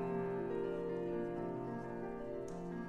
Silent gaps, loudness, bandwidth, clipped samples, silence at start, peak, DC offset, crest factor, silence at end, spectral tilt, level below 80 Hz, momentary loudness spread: none; -42 LUFS; 11 kHz; under 0.1%; 0 s; -28 dBFS; under 0.1%; 12 dB; 0 s; -8.5 dB/octave; -62 dBFS; 5 LU